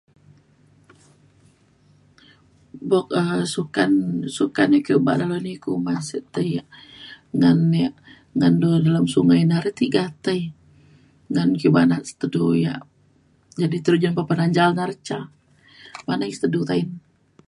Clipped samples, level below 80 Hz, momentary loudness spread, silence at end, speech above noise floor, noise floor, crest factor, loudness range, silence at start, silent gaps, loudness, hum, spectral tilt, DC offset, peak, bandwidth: under 0.1%; -60 dBFS; 14 LU; 0.5 s; 39 dB; -58 dBFS; 18 dB; 5 LU; 2.75 s; none; -21 LUFS; none; -7 dB/octave; under 0.1%; -2 dBFS; 11.5 kHz